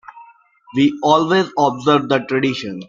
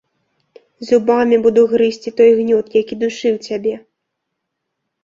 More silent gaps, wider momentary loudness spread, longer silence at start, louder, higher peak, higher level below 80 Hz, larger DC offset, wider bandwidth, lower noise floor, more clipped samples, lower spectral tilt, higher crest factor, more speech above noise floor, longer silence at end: neither; second, 5 LU vs 10 LU; second, 0.15 s vs 0.8 s; about the same, -16 LUFS vs -15 LUFS; about the same, -2 dBFS vs -2 dBFS; about the same, -58 dBFS vs -60 dBFS; neither; about the same, 7.4 kHz vs 7.6 kHz; second, -47 dBFS vs -76 dBFS; neither; about the same, -5.5 dB/octave vs -5.5 dB/octave; about the same, 16 dB vs 14 dB; second, 31 dB vs 62 dB; second, 0.05 s vs 1.25 s